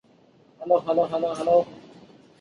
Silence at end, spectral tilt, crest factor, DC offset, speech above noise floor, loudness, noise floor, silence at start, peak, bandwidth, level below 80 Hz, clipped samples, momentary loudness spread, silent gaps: 0.6 s; -6.5 dB/octave; 18 dB; under 0.1%; 35 dB; -23 LUFS; -57 dBFS; 0.6 s; -8 dBFS; 10.5 kHz; -68 dBFS; under 0.1%; 12 LU; none